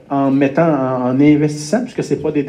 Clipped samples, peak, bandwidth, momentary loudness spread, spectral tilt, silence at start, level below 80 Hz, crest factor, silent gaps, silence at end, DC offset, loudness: under 0.1%; -2 dBFS; 10.5 kHz; 7 LU; -7 dB/octave; 0.1 s; -54 dBFS; 14 dB; none; 0 s; under 0.1%; -15 LUFS